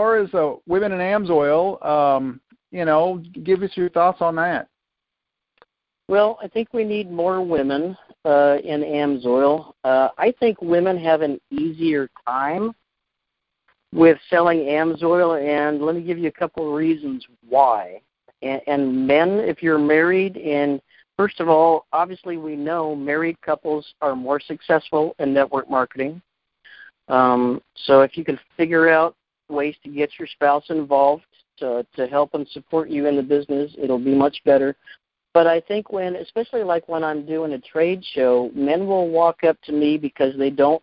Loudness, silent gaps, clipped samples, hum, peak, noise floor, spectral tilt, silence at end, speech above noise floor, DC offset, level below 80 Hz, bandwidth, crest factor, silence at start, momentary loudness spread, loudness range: -20 LUFS; none; under 0.1%; none; -2 dBFS; -83 dBFS; -10.5 dB/octave; 0.05 s; 64 dB; under 0.1%; -60 dBFS; 5.4 kHz; 18 dB; 0 s; 10 LU; 4 LU